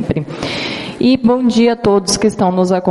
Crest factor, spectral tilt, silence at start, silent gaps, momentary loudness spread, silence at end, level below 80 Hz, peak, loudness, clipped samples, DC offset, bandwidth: 14 dB; -5 dB/octave; 0 s; none; 8 LU; 0 s; -42 dBFS; 0 dBFS; -14 LUFS; under 0.1%; under 0.1%; 11.5 kHz